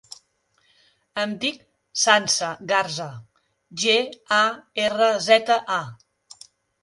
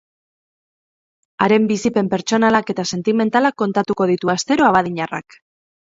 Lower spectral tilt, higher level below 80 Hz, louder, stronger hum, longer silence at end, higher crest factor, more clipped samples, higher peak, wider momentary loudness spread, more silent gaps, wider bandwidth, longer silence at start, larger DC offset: second, -1.5 dB/octave vs -5 dB/octave; second, -70 dBFS vs -58 dBFS; second, -21 LUFS vs -17 LUFS; neither; first, 0.9 s vs 0.7 s; about the same, 22 dB vs 18 dB; neither; about the same, -2 dBFS vs 0 dBFS; first, 14 LU vs 8 LU; neither; first, 11.5 kHz vs 7.8 kHz; second, 1.15 s vs 1.4 s; neither